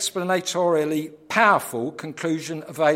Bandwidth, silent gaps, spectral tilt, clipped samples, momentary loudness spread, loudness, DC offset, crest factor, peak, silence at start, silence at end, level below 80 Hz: 16.5 kHz; none; -4 dB/octave; under 0.1%; 12 LU; -23 LUFS; under 0.1%; 20 dB; -2 dBFS; 0 s; 0 s; -72 dBFS